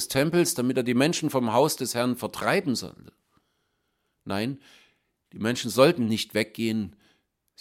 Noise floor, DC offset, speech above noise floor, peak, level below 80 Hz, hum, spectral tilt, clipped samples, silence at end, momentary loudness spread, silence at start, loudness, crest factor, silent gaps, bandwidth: -75 dBFS; under 0.1%; 50 dB; -4 dBFS; -64 dBFS; none; -4.5 dB/octave; under 0.1%; 0.7 s; 12 LU; 0 s; -25 LUFS; 22 dB; none; 16.5 kHz